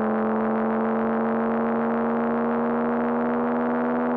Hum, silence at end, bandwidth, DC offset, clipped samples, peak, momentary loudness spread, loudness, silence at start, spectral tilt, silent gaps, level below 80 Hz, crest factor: none; 0 s; 4 kHz; under 0.1%; under 0.1%; -12 dBFS; 0 LU; -24 LUFS; 0 s; -10.5 dB/octave; none; -58 dBFS; 10 dB